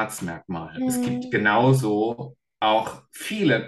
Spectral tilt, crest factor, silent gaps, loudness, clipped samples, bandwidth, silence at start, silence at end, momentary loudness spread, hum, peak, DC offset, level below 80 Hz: -5.5 dB/octave; 18 dB; none; -23 LUFS; under 0.1%; 12.5 kHz; 0 s; 0 s; 15 LU; none; -6 dBFS; under 0.1%; -60 dBFS